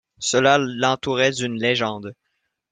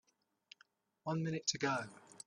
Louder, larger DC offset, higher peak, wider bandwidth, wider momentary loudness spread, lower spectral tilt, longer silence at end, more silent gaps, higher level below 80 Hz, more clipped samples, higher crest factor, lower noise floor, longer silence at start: first, -20 LUFS vs -38 LUFS; neither; first, -2 dBFS vs -20 dBFS; about the same, 9.8 kHz vs 10.5 kHz; about the same, 10 LU vs 12 LU; about the same, -3.5 dB/octave vs -4 dB/octave; first, 0.6 s vs 0.1 s; neither; first, -60 dBFS vs -82 dBFS; neither; about the same, 20 dB vs 22 dB; about the same, -74 dBFS vs -72 dBFS; second, 0.2 s vs 1.05 s